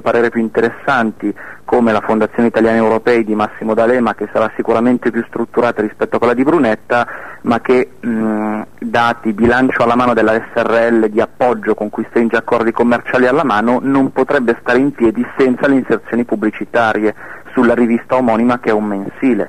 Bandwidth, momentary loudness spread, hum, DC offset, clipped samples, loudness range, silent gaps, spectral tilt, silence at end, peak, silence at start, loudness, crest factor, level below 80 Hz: 10 kHz; 6 LU; none; 1%; under 0.1%; 2 LU; none; -7 dB/octave; 0 s; -2 dBFS; 0.05 s; -14 LUFS; 10 dB; -46 dBFS